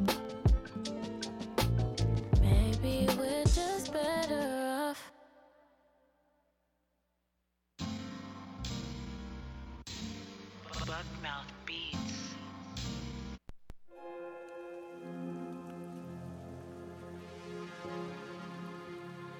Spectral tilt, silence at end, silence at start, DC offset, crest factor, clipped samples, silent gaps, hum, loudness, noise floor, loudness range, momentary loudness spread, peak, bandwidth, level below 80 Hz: -5.5 dB/octave; 0 s; 0 s; under 0.1%; 18 dB; under 0.1%; none; none; -37 LUFS; -81 dBFS; 14 LU; 17 LU; -18 dBFS; 16.5 kHz; -42 dBFS